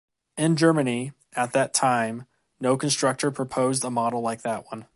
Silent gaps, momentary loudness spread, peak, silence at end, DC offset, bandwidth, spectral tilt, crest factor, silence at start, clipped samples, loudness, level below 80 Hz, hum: none; 10 LU; -6 dBFS; 0.1 s; under 0.1%; 11.5 kHz; -4.5 dB/octave; 18 dB; 0.35 s; under 0.1%; -24 LUFS; -68 dBFS; none